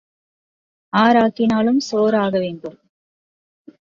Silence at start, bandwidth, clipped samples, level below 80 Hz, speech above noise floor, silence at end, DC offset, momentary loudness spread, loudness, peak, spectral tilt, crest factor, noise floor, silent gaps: 0.95 s; 7.4 kHz; under 0.1%; -60 dBFS; over 73 dB; 1.25 s; under 0.1%; 13 LU; -17 LUFS; -2 dBFS; -6 dB/octave; 18 dB; under -90 dBFS; none